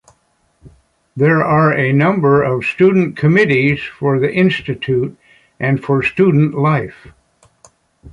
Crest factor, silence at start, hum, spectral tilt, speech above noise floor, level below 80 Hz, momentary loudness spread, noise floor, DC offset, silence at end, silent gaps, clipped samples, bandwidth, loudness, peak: 14 dB; 0.65 s; none; -8.5 dB/octave; 46 dB; -48 dBFS; 7 LU; -60 dBFS; under 0.1%; 0.05 s; none; under 0.1%; 9.6 kHz; -14 LUFS; -2 dBFS